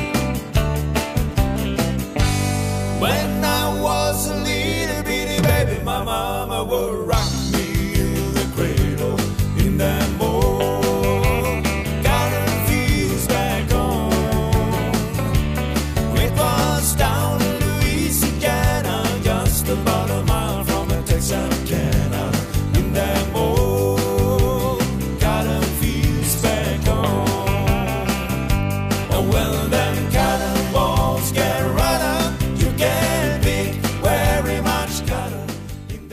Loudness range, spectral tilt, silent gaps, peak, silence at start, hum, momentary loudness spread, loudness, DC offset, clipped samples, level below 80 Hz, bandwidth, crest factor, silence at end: 2 LU; -5 dB/octave; none; -6 dBFS; 0 s; none; 4 LU; -20 LUFS; 0.1%; under 0.1%; -26 dBFS; 15.5 kHz; 14 dB; 0 s